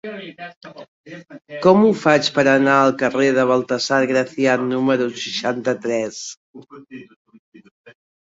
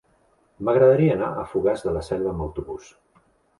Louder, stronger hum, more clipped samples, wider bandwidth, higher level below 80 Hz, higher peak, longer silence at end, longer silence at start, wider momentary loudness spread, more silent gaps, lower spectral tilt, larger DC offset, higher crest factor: first, -17 LUFS vs -22 LUFS; neither; neither; second, 8 kHz vs 11.5 kHz; second, -64 dBFS vs -44 dBFS; about the same, -2 dBFS vs -4 dBFS; second, 0.35 s vs 0.8 s; second, 0.05 s vs 0.6 s; first, 22 LU vs 16 LU; first, 0.56-0.61 s, 0.88-1.04 s, 6.37-6.54 s, 7.16-7.25 s, 7.39-7.52 s, 7.71-7.84 s vs none; second, -5 dB/octave vs -8.5 dB/octave; neither; about the same, 18 dB vs 18 dB